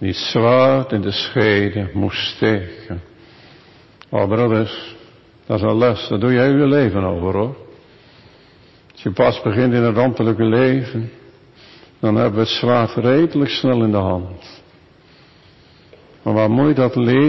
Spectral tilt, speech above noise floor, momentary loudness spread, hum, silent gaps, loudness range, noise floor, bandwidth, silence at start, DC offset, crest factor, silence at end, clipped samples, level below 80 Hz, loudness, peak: -7.5 dB/octave; 32 dB; 13 LU; none; none; 4 LU; -48 dBFS; 6 kHz; 0 s; under 0.1%; 12 dB; 0 s; under 0.1%; -42 dBFS; -17 LUFS; -4 dBFS